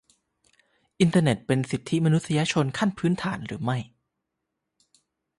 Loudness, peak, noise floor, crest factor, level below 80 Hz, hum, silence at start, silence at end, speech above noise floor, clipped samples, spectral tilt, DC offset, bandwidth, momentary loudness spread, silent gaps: -25 LUFS; -8 dBFS; -82 dBFS; 18 dB; -60 dBFS; none; 1 s; 1.5 s; 58 dB; under 0.1%; -6 dB/octave; under 0.1%; 11.5 kHz; 9 LU; none